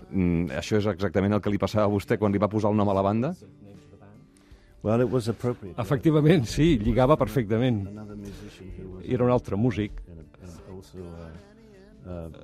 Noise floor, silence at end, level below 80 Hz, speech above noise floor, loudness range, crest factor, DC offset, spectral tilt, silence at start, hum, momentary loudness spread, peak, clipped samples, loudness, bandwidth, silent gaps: -53 dBFS; 0 s; -44 dBFS; 28 dB; 6 LU; 20 dB; under 0.1%; -7.5 dB/octave; 0 s; none; 21 LU; -6 dBFS; under 0.1%; -25 LUFS; 14.5 kHz; none